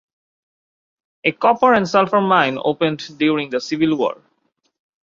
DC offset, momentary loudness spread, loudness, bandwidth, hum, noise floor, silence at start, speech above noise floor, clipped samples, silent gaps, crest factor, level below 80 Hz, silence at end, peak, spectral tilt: under 0.1%; 8 LU; -17 LUFS; 7.4 kHz; none; -68 dBFS; 1.25 s; 51 dB; under 0.1%; none; 18 dB; -62 dBFS; 0.9 s; -2 dBFS; -5.5 dB/octave